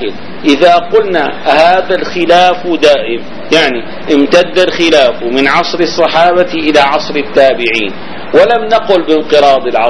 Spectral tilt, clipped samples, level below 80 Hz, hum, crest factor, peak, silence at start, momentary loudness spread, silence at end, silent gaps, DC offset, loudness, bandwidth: -4 dB/octave; 2%; -42 dBFS; none; 10 dB; 0 dBFS; 0 s; 6 LU; 0 s; none; 8%; -9 LUFS; 11 kHz